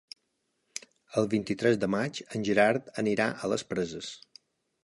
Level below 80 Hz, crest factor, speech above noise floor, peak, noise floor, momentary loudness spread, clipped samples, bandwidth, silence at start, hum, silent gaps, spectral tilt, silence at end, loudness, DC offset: -66 dBFS; 22 dB; 49 dB; -8 dBFS; -78 dBFS; 18 LU; under 0.1%; 11.5 kHz; 1.1 s; none; none; -5 dB/octave; 0.7 s; -29 LUFS; under 0.1%